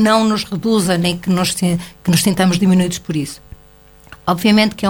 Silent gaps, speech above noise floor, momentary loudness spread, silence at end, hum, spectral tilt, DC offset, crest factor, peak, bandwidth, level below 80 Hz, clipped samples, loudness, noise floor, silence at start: none; 30 dB; 10 LU; 0 s; none; -5 dB/octave; under 0.1%; 16 dB; 0 dBFS; 19 kHz; -46 dBFS; under 0.1%; -16 LUFS; -45 dBFS; 0 s